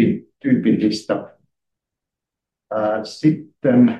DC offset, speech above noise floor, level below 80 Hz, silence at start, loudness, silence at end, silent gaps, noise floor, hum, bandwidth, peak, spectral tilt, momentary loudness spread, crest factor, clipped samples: under 0.1%; 68 dB; -64 dBFS; 0 s; -20 LUFS; 0 s; none; -85 dBFS; none; 9.4 kHz; -4 dBFS; -7.5 dB/octave; 9 LU; 16 dB; under 0.1%